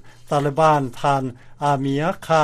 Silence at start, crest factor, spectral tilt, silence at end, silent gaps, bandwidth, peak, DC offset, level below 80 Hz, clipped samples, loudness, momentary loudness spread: 0.05 s; 16 dB; -6.5 dB/octave; 0 s; none; 14 kHz; -4 dBFS; under 0.1%; -50 dBFS; under 0.1%; -20 LUFS; 7 LU